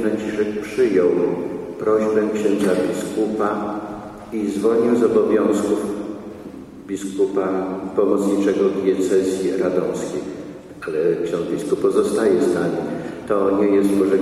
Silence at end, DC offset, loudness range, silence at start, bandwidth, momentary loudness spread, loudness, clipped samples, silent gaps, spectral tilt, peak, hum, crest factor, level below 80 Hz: 0 s; under 0.1%; 2 LU; 0 s; 14 kHz; 13 LU; -20 LUFS; under 0.1%; none; -6.5 dB/octave; -4 dBFS; none; 16 dB; -54 dBFS